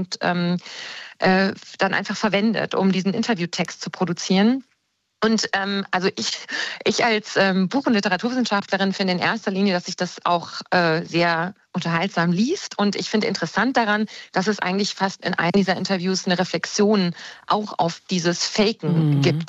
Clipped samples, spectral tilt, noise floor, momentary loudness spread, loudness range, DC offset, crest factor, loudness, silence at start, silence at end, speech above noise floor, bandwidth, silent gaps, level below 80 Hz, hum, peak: under 0.1%; -5 dB/octave; -70 dBFS; 6 LU; 1 LU; under 0.1%; 14 dB; -21 LUFS; 0 s; 0 s; 49 dB; 8.2 kHz; none; -64 dBFS; none; -8 dBFS